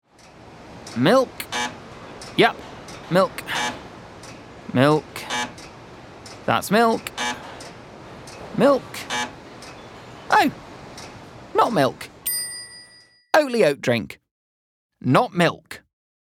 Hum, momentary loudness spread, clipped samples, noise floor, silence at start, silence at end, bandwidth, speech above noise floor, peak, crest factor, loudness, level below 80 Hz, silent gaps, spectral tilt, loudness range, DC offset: none; 22 LU; under 0.1%; -52 dBFS; 0.5 s; 0.45 s; 19 kHz; 32 dB; -2 dBFS; 22 dB; -21 LUFS; -58 dBFS; 14.31-14.90 s; -4.5 dB/octave; 3 LU; under 0.1%